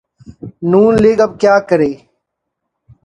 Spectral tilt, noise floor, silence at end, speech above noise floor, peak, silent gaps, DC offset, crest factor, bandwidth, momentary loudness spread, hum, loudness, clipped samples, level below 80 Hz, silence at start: -7.5 dB/octave; -75 dBFS; 1.1 s; 64 dB; 0 dBFS; none; under 0.1%; 14 dB; 10 kHz; 23 LU; none; -12 LUFS; under 0.1%; -44 dBFS; 0.3 s